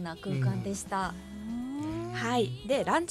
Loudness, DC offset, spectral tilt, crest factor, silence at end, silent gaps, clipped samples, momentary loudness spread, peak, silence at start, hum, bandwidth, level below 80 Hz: -32 LUFS; under 0.1%; -5.5 dB/octave; 18 dB; 0 s; none; under 0.1%; 9 LU; -14 dBFS; 0 s; none; 14 kHz; -54 dBFS